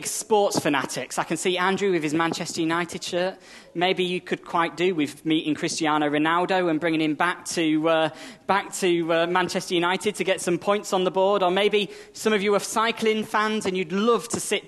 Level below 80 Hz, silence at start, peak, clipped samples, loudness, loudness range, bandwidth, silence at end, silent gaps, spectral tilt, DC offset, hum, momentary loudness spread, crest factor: -68 dBFS; 0 s; -6 dBFS; under 0.1%; -23 LUFS; 2 LU; 13 kHz; 0 s; none; -4 dB/octave; under 0.1%; none; 5 LU; 18 dB